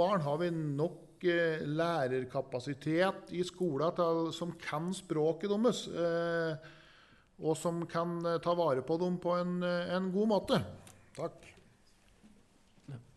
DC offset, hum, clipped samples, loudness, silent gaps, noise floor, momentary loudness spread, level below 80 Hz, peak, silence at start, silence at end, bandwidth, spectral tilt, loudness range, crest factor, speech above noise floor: under 0.1%; none; under 0.1%; -34 LUFS; none; -65 dBFS; 9 LU; -70 dBFS; -16 dBFS; 0 s; 0.15 s; 12 kHz; -6 dB/octave; 2 LU; 18 dB; 31 dB